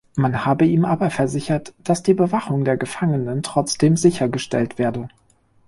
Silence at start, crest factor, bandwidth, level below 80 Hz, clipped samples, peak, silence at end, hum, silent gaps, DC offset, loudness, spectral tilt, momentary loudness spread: 0.15 s; 16 dB; 11.5 kHz; -52 dBFS; under 0.1%; -2 dBFS; 0.6 s; none; none; under 0.1%; -20 LUFS; -6 dB/octave; 7 LU